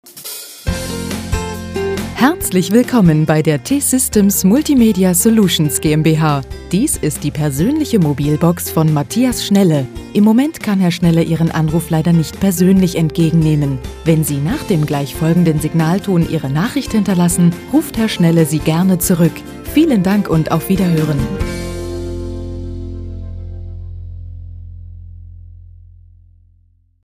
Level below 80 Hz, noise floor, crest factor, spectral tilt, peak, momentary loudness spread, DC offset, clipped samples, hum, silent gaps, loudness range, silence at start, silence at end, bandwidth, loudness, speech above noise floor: -32 dBFS; -53 dBFS; 14 dB; -6 dB/octave; 0 dBFS; 15 LU; under 0.1%; under 0.1%; none; none; 13 LU; 0.05 s; 1.35 s; 16 kHz; -14 LUFS; 40 dB